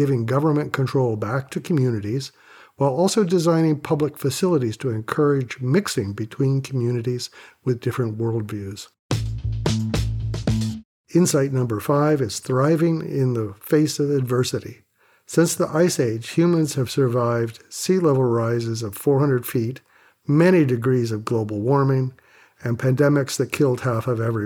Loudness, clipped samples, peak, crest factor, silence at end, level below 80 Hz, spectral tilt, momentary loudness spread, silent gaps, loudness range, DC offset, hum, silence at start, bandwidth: -21 LUFS; under 0.1%; -6 dBFS; 16 dB; 0 s; -44 dBFS; -6.5 dB/octave; 9 LU; 8.99-9.09 s, 10.85-11.04 s; 5 LU; under 0.1%; none; 0 s; 19 kHz